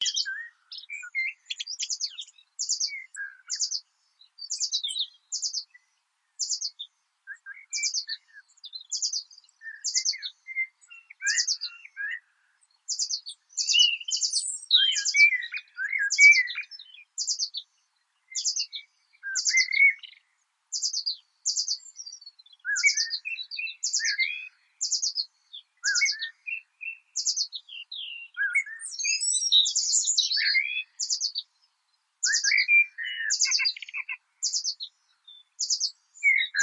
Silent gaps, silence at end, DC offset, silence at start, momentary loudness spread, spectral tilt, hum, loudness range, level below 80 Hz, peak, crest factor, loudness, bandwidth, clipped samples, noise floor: none; 0 s; under 0.1%; 0 s; 19 LU; 11 dB/octave; none; 10 LU; under -90 dBFS; -6 dBFS; 22 dB; -25 LUFS; 11 kHz; under 0.1%; -74 dBFS